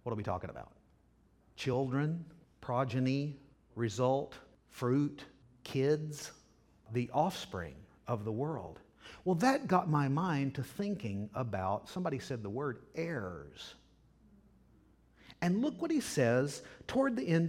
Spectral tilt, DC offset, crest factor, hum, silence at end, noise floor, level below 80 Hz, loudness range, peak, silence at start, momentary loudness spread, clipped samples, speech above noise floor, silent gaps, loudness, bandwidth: -6.5 dB/octave; under 0.1%; 22 dB; none; 0 s; -68 dBFS; -66 dBFS; 6 LU; -14 dBFS; 0.05 s; 19 LU; under 0.1%; 33 dB; none; -35 LUFS; 16.5 kHz